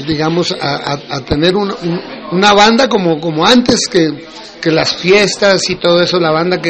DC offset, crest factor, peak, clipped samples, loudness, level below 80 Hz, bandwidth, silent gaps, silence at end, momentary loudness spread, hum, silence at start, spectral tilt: under 0.1%; 12 dB; 0 dBFS; under 0.1%; -11 LUFS; -40 dBFS; 8.8 kHz; none; 0 s; 11 LU; none; 0 s; -4 dB/octave